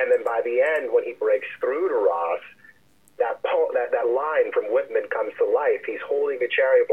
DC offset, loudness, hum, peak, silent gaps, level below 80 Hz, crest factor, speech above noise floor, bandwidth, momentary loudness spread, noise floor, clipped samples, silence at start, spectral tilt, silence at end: 0.1%; -23 LUFS; none; -8 dBFS; none; -76 dBFS; 14 dB; 34 dB; 8.2 kHz; 6 LU; -57 dBFS; under 0.1%; 0 s; -4.5 dB/octave; 0 s